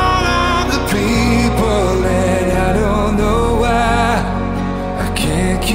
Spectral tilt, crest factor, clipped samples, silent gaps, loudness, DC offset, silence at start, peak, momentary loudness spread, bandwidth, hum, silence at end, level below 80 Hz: -5.5 dB/octave; 12 dB; under 0.1%; none; -15 LUFS; under 0.1%; 0 s; -2 dBFS; 6 LU; 16.5 kHz; none; 0 s; -22 dBFS